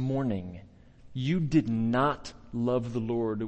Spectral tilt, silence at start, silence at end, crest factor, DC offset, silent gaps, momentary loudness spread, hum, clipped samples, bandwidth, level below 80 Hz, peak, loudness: -8 dB/octave; 0 s; 0 s; 18 dB; under 0.1%; none; 13 LU; none; under 0.1%; 8.6 kHz; -52 dBFS; -12 dBFS; -29 LUFS